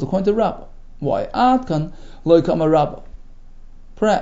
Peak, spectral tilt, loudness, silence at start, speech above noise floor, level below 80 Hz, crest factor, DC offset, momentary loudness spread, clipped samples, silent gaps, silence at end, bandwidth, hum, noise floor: -2 dBFS; -7.5 dB/octave; -18 LUFS; 0 s; 20 dB; -38 dBFS; 18 dB; under 0.1%; 13 LU; under 0.1%; none; 0 s; 7.8 kHz; none; -37 dBFS